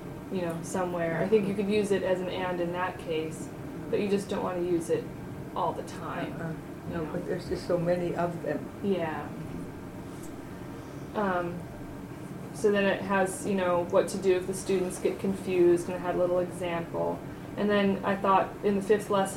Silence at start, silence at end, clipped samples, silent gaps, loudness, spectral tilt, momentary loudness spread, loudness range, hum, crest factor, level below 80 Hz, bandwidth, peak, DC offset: 0 s; 0 s; under 0.1%; none; -29 LUFS; -6 dB/octave; 14 LU; 7 LU; none; 18 dB; -54 dBFS; 16.5 kHz; -10 dBFS; under 0.1%